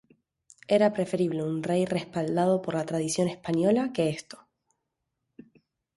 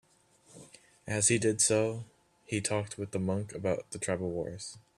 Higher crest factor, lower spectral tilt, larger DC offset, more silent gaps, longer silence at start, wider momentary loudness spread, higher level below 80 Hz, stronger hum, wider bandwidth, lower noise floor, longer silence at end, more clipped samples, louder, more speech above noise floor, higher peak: about the same, 18 dB vs 20 dB; first, -6 dB/octave vs -4 dB/octave; neither; neither; first, 0.7 s vs 0.55 s; second, 6 LU vs 15 LU; about the same, -68 dBFS vs -66 dBFS; neither; second, 11.5 kHz vs 13.5 kHz; first, -82 dBFS vs -64 dBFS; first, 1.6 s vs 0.2 s; neither; first, -27 LUFS vs -31 LUFS; first, 56 dB vs 32 dB; about the same, -10 dBFS vs -12 dBFS